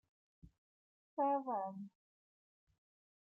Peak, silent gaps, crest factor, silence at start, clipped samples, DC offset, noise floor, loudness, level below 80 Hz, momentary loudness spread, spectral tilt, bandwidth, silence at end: -26 dBFS; 0.58-1.17 s; 18 dB; 0.45 s; under 0.1%; under 0.1%; under -90 dBFS; -40 LUFS; -78 dBFS; 16 LU; -9.5 dB/octave; 3 kHz; 1.35 s